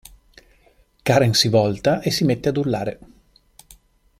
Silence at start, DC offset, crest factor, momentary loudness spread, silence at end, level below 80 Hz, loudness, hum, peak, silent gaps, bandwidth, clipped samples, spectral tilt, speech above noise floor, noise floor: 1.05 s; under 0.1%; 18 dB; 10 LU; 1.25 s; -50 dBFS; -19 LUFS; none; -2 dBFS; none; 16 kHz; under 0.1%; -5 dB/octave; 38 dB; -57 dBFS